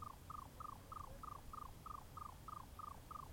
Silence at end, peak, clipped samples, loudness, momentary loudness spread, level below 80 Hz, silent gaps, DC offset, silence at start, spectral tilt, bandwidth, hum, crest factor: 0 s; -40 dBFS; under 0.1%; -54 LUFS; 2 LU; -62 dBFS; none; under 0.1%; 0 s; -5 dB/octave; 16.5 kHz; none; 14 dB